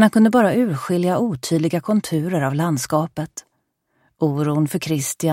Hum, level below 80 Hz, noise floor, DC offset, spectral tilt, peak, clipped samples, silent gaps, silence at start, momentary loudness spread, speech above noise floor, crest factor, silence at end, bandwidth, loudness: none; -60 dBFS; -70 dBFS; under 0.1%; -6 dB/octave; -2 dBFS; under 0.1%; none; 0 s; 8 LU; 51 dB; 16 dB; 0 s; 16.5 kHz; -20 LUFS